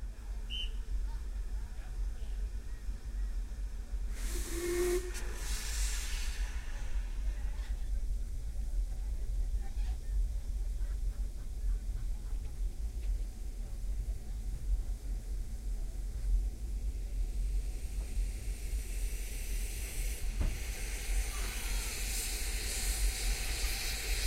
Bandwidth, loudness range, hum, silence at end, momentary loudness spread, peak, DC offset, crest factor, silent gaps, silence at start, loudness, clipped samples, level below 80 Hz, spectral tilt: 16 kHz; 5 LU; none; 0 s; 8 LU; -20 dBFS; under 0.1%; 14 dB; none; 0 s; -39 LUFS; under 0.1%; -36 dBFS; -3.5 dB/octave